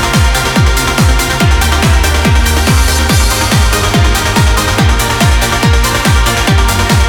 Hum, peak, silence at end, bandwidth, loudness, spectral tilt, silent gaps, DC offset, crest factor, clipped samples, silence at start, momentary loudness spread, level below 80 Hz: none; 0 dBFS; 0 s; 19.5 kHz; -10 LUFS; -4 dB/octave; none; under 0.1%; 8 dB; under 0.1%; 0 s; 1 LU; -14 dBFS